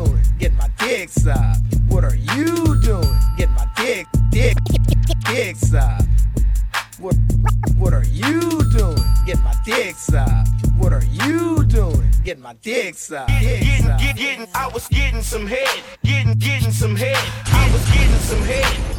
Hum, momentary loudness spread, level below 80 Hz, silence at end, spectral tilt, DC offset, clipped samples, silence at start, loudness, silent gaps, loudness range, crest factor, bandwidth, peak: none; 5 LU; -18 dBFS; 0 s; -5.5 dB/octave; under 0.1%; under 0.1%; 0 s; -18 LUFS; none; 2 LU; 14 dB; 17 kHz; -2 dBFS